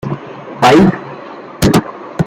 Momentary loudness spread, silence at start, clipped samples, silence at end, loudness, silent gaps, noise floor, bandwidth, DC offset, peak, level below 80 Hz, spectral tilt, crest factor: 21 LU; 0.05 s; under 0.1%; 0 s; -11 LUFS; none; -30 dBFS; 16 kHz; under 0.1%; 0 dBFS; -36 dBFS; -6 dB/octave; 14 dB